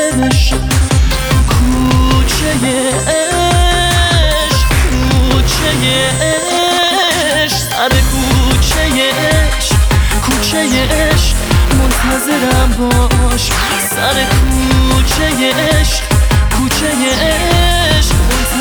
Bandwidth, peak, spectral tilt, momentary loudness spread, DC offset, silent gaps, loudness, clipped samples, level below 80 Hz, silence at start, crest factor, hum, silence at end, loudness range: over 20 kHz; 0 dBFS; -4 dB/octave; 2 LU; under 0.1%; none; -11 LUFS; under 0.1%; -16 dBFS; 0 s; 10 dB; none; 0 s; 1 LU